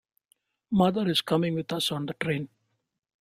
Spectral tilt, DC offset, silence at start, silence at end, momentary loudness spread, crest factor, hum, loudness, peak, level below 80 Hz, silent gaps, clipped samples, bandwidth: -5.5 dB/octave; under 0.1%; 0.7 s; 0.8 s; 7 LU; 20 dB; none; -27 LUFS; -10 dBFS; -64 dBFS; none; under 0.1%; 15.5 kHz